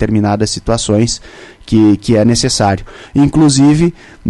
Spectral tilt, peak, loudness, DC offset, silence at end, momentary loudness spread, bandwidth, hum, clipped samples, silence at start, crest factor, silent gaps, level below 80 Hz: -5.5 dB/octave; 0 dBFS; -12 LUFS; under 0.1%; 0 s; 7 LU; 11.5 kHz; none; under 0.1%; 0 s; 12 dB; none; -32 dBFS